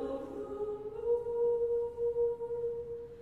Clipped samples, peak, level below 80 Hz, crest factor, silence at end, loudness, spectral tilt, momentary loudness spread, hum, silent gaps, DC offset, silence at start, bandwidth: under 0.1%; -22 dBFS; -60 dBFS; 12 dB; 0 s; -35 LUFS; -8.5 dB/octave; 9 LU; none; none; under 0.1%; 0 s; 4.2 kHz